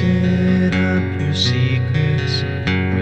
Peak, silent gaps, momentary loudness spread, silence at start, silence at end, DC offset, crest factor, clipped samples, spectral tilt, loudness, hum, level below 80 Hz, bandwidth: -2 dBFS; none; 4 LU; 0 s; 0 s; 0.9%; 14 dB; under 0.1%; -6.5 dB/octave; -17 LUFS; none; -42 dBFS; 8.4 kHz